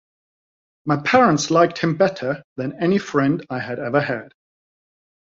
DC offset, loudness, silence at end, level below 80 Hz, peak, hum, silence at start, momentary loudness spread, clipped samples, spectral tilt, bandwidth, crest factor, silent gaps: under 0.1%; -20 LUFS; 1.05 s; -60 dBFS; -2 dBFS; none; 0.85 s; 12 LU; under 0.1%; -5.5 dB/octave; 7.8 kHz; 18 dB; 2.44-2.56 s